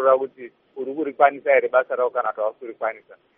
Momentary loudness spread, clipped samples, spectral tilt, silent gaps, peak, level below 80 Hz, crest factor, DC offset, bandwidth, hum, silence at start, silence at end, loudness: 16 LU; under 0.1%; -2 dB/octave; none; -2 dBFS; -82 dBFS; 20 dB; under 0.1%; 3.7 kHz; none; 0 s; 0.25 s; -22 LUFS